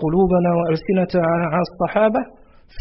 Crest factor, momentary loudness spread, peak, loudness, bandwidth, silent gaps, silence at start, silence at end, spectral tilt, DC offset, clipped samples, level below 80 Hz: 12 dB; 5 LU; -6 dBFS; -19 LUFS; 5.8 kHz; none; 0 s; 0 s; -11.5 dB/octave; under 0.1%; under 0.1%; -42 dBFS